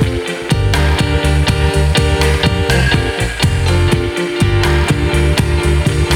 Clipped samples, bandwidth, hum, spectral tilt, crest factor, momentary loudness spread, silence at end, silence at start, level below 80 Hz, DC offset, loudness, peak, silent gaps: under 0.1%; 16 kHz; none; -5.5 dB/octave; 12 dB; 3 LU; 0 s; 0 s; -18 dBFS; under 0.1%; -14 LUFS; 0 dBFS; none